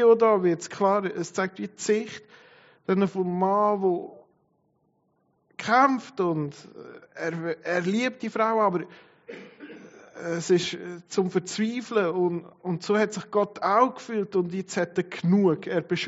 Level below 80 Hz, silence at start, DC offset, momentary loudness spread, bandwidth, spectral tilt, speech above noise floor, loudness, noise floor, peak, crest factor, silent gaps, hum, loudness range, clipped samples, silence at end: -74 dBFS; 0 s; under 0.1%; 21 LU; 8 kHz; -5 dB/octave; 45 dB; -26 LUFS; -70 dBFS; -6 dBFS; 20 dB; none; none; 3 LU; under 0.1%; 0 s